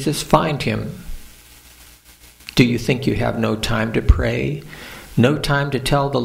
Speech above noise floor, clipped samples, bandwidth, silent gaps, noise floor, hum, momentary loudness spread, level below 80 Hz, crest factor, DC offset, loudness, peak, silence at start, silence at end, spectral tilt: 28 dB; under 0.1%; 16 kHz; none; -46 dBFS; none; 16 LU; -28 dBFS; 20 dB; under 0.1%; -19 LUFS; 0 dBFS; 0 s; 0 s; -6 dB/octave